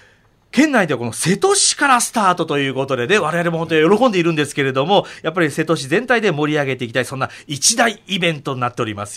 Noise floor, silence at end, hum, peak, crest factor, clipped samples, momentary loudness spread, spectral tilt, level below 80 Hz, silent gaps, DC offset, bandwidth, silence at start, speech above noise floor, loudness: -53 dBFS; 0 s; none; -2 dBFS; 16 dB; under 0.1%; 8 LU; -3.5 dB/octave; -58 dBFS; none; under 0.1%; 16 kHz; 0.55 s; 36 dB; -17 LUFS